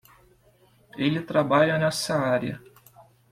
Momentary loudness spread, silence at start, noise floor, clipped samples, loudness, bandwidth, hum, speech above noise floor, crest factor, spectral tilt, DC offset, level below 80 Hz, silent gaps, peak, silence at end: 15 LU; 0.95 s; -60 dBFS; under 0.1%; -24 LUFS; 15.5 kHz; none; 36 dB; 18 dB; -5.5 dB/octave; under 0.1%; -62 dBFS; none; -8 dBFS; 0.3 s